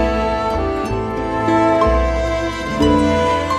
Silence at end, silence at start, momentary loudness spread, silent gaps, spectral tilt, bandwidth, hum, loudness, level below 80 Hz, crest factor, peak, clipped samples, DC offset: 0 s; 0 s; 7 LU; none; -6.5 dB/octave; 13 kHz; none; -17 LUFS; -26 dBFS; 14 dB; -2 dBFS; under 0.1%; under 0.1%